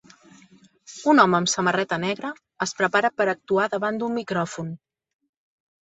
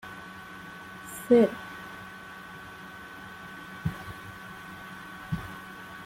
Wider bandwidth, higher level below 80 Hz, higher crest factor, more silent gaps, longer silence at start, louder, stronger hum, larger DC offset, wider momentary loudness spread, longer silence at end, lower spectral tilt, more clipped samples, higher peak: second, 8.4 kHz vs 16.5 kHz; second, -66 dBFS vs -58 dBFS; about the same, 24 dB vs 24 dB; neither; first, 0.9 s vs 0 s; first, -22 LUFS vs -32 LUFS; neither; neither; second, 16 LU vs 20 LU; first, 1.1 s vs 0 s; second, -4 dB/octave vs -6 dB/octave; neither; first, -2 dBFS vs -10 dBFS